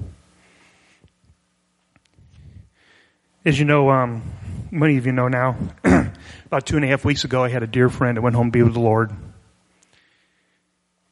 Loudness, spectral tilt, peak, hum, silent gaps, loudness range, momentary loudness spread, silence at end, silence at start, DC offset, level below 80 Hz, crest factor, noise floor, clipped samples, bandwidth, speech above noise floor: -19 LUFS; -7 dB/octave; -2 dBFS; none; none; 3 LU; 13 LU; 1.8 s; 0 s; under 0.1%; -44 dBFS; 20 dB; -69 dBFS; under 0.1%; 11.5 kHz; 51 dB